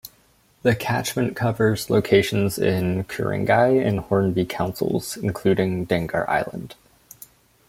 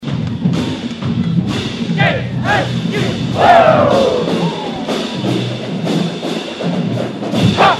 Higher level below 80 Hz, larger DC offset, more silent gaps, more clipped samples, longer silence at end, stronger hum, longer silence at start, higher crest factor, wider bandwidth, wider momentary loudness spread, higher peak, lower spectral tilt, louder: second, -52 dBFS vs -44 dBFS; neither; neither; neither; first, 0.95 s vs 0 s; neither; about the same, 0.05 s vs 0 s; about the same, 18 dB vs 14 dB; first, 16.5 kHz vs 12.5 kHz; second, 7 LU vs 10 LU; second, -4 dBFS vs 0 dBFS; about the same, -6 dB/octave vs -6 dB/octave; second, -22 LUFS vs -15 LUFS